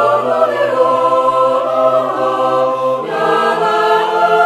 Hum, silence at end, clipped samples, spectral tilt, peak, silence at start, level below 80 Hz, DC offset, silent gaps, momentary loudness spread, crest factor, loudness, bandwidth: none; 0 s; under 0.1%; -5 dB/octave; 0 dBFS; 0 s; -62 dBFS; under 0.1%; none; 3 LU; 12 dB; -13 LUFS; 13 kHz